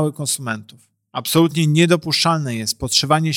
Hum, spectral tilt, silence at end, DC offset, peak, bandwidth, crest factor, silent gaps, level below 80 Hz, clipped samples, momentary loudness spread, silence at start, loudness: none; -4.5 dB/octave; 0 s; under 0.1%; -2 dBFS; 17 kHz; 16 dB; none; -48 dBFS; under 0.1%; 12 LU; 0 s; -17 LUFS